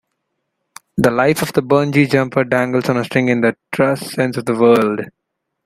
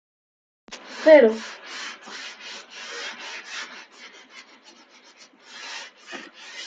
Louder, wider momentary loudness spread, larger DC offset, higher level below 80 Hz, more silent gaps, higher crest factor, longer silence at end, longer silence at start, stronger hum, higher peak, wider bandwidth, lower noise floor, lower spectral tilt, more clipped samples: first, -16 LUFS vs -21 LUFS; second, 7 LU vs 29 LU; neither; first, -54 dBFS vs -78 dBFS; neither; second, 16 dB vs 24 dB; first, 0.55 s vs 0 s; first, 0.95 s vs 0.7 s; neither; about the same, 0 dBFS vs -2 dBFS; first, 16 kHz vs 7.8 kHz; first, -73 dBFS vs -52 dBFS; first, -6 dB/octave vs -3 dB/octave; neither